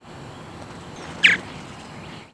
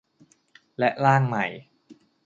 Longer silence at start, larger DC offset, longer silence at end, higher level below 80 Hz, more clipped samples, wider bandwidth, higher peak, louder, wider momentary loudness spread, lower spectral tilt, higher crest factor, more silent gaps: second, 0 s vs 0.8 s; neither; second, 0 s vs 0.3 s; first, -54 dBFS vs -68 dBFS; neither; first, 11 kHz vs 7.6 kHz; about the same, -2 dBFS vs -4 dBFS; first, -17 LUFS vs -23 LUFS; about the same, 22 LU vs 22 LU; second, -2.5 dB/octave vs -7.5 dB/octave; about the same, 24 dB vs 22 dB; neither